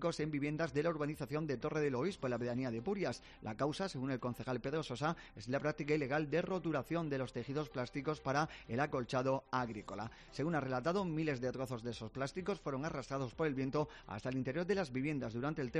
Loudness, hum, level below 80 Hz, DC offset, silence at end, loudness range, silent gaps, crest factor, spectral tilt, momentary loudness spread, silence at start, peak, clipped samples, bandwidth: -39 LUFS; none; -62 dBFS; under 0.1%; 0 s; 2 LU; none; 16 dB; -6.5 dB/octave; 6 LU; 0 s; -22 dBFS; under 0.1%; 11.5 kHz